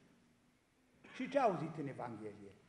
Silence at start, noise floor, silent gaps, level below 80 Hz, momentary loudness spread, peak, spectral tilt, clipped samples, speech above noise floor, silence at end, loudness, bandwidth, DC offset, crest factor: 1.05 s; -74 dBFS; none; -80 dBFS; 16 LU; -20 dBFS; -7 dB/octave; under 0.1%; 34 dB; 0.15 s; -40 LUFS; 11.5 kHz; under 0.1%; 22 dB